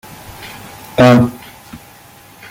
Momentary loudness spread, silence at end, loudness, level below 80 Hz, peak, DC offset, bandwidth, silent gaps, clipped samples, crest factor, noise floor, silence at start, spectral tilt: 26 LU; 0.75 s; -11 LUFS; -44 dBFS; 0 dBFS; under 0.1%; 17 kHz; none; under 0.1%; 16 dB; -41 dBFS; 0.3 s; -7 dB/octave